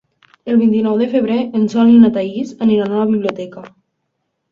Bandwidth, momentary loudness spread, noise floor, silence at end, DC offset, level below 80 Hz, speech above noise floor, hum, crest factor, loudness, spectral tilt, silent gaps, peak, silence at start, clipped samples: 7 kHz; 13 LU; -71 dBFS; 0.85 s; under 0.1%; -56 dBFS; 58 dB; none; 14 dB; -14 LUFS; -8 dB/octave; none; 0 dBFS; 0.45 s; under 0.1%